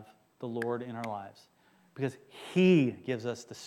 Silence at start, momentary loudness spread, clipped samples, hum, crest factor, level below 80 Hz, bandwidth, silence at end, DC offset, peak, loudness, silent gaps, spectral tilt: 0 s; 18 LU; under 0.1%; none; 18 dB; -78 dBFS; 12 kHz; 0 s; under 0.1%; -14 dBFS; -31 LUFS; none; -7 dB/octave